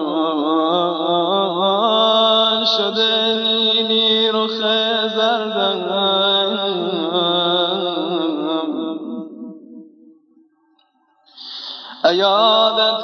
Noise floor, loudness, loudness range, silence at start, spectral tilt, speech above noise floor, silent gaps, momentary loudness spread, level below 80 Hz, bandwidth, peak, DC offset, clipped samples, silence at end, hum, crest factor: -60 dBFS; -16 LUFS; 12 LU; 0 s; -5 dB/octave; 45 dB; none; 15 LU; under -90 dBFS; 6.6 kHz; -2 dBFS; under 0.1%; under 0.1%; 0 s; none; 16 dB